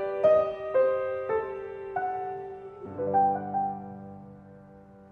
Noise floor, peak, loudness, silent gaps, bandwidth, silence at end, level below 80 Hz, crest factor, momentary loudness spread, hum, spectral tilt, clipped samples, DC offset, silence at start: -51 dBFS; -12 dBFS; -28 LUFS; none; 4.7 kHz; 0.05 s; -64 dBFS; 18 dB; 19 LU; none; -8.5 dB/octave; under 0.1%; under 0.1%; 0 s